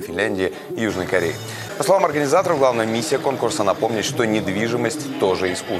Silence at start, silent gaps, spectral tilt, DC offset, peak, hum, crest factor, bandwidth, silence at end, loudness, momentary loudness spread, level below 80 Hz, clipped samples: 0 s; none; -4.5 dB/octave; under 0.1%; 0 dBFS; none; 20 dB; 15.5 kHz; 0 s; -20 LUFS; 7 LU; -56 dBFS; under 0.1%